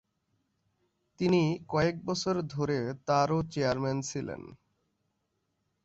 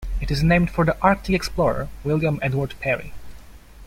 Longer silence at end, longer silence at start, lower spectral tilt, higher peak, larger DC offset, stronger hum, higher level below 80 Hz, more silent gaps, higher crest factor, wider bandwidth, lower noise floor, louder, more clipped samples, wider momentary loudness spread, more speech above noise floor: first, 1.3 s vs 0 s; first, 1.2 s vs 0 s; about the same, -6 dB/octave vs -7 dB/octave; second, -12 dBFS vs -2 dBFS; neither; neither; second, -60 dBFS vs -34 dBFS; neither; about the same, 20 dB vs 20 dB; second, 8 kHz vs 15.5 kHz; first, -79 dBFS vs -42 dBFS; second, -30 LUFS vs -22 LUFS; neither; about the same, 8 LU vs 8 LU; first, 50 dB vs 22 dB